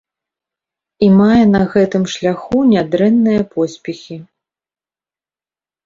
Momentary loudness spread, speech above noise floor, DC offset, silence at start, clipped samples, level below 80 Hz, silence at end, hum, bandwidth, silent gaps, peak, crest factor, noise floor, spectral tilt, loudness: 17 LU; over 77 dB; under 0.1%; 1 s; under 0.1%; -46 dBFS; 1.6 s; none; 7.6 kHz; none; 0 dBFS; 14 dB; under -90 dBFS; -7 dB/octave; -13 LUFS